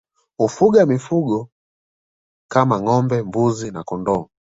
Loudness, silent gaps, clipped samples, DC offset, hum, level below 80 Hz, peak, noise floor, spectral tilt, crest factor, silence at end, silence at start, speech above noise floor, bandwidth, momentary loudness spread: -19 LUFS; 1.52-2.49 s; under 0.1%; under 0.1%; none; -54 dBFS; -2 dBFS; under -90 dBFS; -7.5 dB/octave; 18 dB; 0.35 s; 0.4 s; over 73 dB; 8 kHz; 11 LU